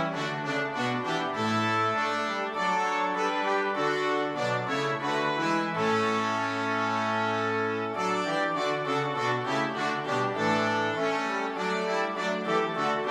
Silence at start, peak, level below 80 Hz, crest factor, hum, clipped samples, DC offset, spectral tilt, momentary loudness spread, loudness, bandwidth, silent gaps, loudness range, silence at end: 0 s; -12 dBFS; -72 dBFS; 14 dB; none; under 0.1%; under 0.1%; -4.5 dB/octave; 3 LU; -28 LUFS; 14 kHz; none; 1 LU; 0 s